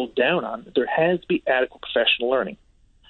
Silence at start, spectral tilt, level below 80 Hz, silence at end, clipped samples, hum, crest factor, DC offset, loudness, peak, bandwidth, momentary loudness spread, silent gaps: 0 s; -7.5 dB/octave; -58 dBFS; 0.55 s; under 0.1%; none; 16 dB; under 0.1%; -22 LUFS; -6 dBFS; 4.4 kHz; 6 LU; none